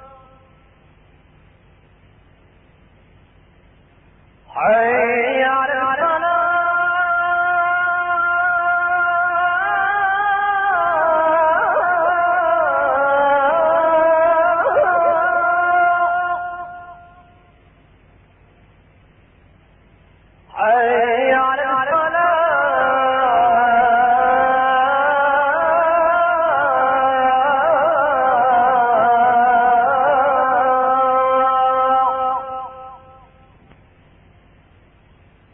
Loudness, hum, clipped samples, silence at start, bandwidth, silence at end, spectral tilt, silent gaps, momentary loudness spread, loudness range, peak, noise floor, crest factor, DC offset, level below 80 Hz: -16 LUFS; none; under 0.1%; 0.05 s; 3.5 kHz; 2.55 s; -9 dB/octave; none; 3 LU; 7 LU; -4 dBFS; -50 dBFS; 12 dB; under 0.1%; -52 dBFS